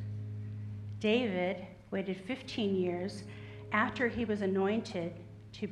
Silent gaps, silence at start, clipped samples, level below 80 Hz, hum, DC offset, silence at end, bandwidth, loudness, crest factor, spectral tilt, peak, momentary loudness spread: none; 0 s; under 0.1%; -62 dBFS; none; under 0.1%; 0 s; 10.5 kHz; -35 LUFS; 20 dB; -6.5 dB/octave; -16 dBFS; 12 LU